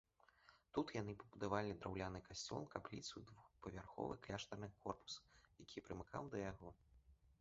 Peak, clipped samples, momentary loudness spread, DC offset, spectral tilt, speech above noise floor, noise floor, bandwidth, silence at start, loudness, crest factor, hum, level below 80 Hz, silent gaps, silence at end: -26 dBFS; under 0.1%; 12 LU; under 0.1%; -4.5 dB/octave; 23 dB; -73 dBFS; 7.6 kHz; 0.45 s; -50 LUFS; 26 dB; none; -68 dBFS; none; 0.1 s